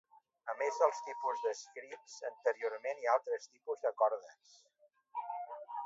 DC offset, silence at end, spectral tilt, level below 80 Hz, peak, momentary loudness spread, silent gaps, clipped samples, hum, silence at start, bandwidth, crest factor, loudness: under 0.1%; 0 s; 2 dB/octave; under -90 dBFS; -14 dBFS; 13 LU; none; under 0.1%; none; 0.45 s; 7.6 kHz; 22 dB; -37 LUFS